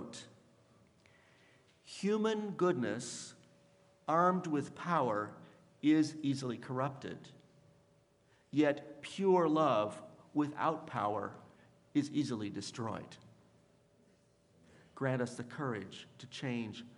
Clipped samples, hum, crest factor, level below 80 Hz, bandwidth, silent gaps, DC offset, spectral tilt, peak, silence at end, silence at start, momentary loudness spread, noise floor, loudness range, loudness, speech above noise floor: under 0.1%; none; 20 dB; -82 dBFS; 11.5 kHz; none; under 0.1%; -6 dB/octave; -16 dBFS; 0.05 s; 0 s; 17 LU; -70 dBFS; 8 LU; -36 LUFS; 35 dB